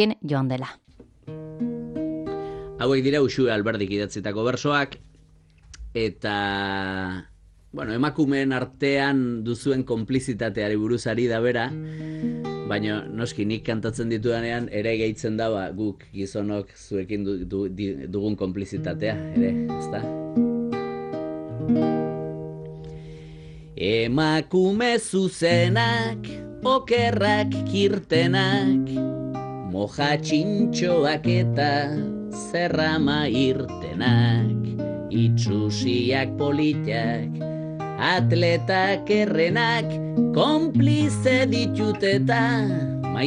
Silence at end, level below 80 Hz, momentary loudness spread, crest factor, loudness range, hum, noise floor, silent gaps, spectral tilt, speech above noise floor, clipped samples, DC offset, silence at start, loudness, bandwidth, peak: 0 s; -52 dBFS; 11 LU; 16 dB; 6 LU; none; -54 dBFS; none; -6 dB/octave; 31 dB; under 0.1%; under 0.1%; 0 s; -24 LUFS; 11 kHz; -8 dBFS